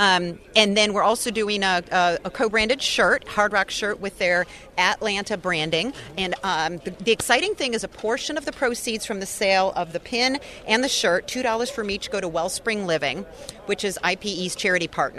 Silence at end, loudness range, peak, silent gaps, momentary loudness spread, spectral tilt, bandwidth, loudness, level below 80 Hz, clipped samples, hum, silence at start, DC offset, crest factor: 0 s; 4 LU; 0 dBFS; none; 8 LU; -2.5 dB/octave; 13.5 kHz; -22 LUFS; -52 dBFS; under 0.1%; none; 0 s; under 0.1%; 22 dB